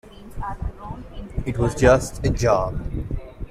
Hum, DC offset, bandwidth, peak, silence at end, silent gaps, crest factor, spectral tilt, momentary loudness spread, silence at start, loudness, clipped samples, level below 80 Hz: none; under 0.1%; 15.5 kHz; -2 dBFS; 0.05 s; none; 22 dB; -6 dB/octave; 19 LU; 0.05 s; -22 LUFS; under 0.1%; -32 dBFS